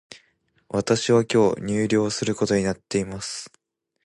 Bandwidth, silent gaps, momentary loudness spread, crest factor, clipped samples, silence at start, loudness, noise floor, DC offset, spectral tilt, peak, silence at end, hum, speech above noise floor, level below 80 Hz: 11.5 kHz; none; 12 LU; 18 dB; under 0.1%; 0.1 s; -23 LUFS; -65 dBFS; under 0.1%; -5 dB/octave; -6 dBFS; 0.55 s; none; 43 dB; -54 dBFS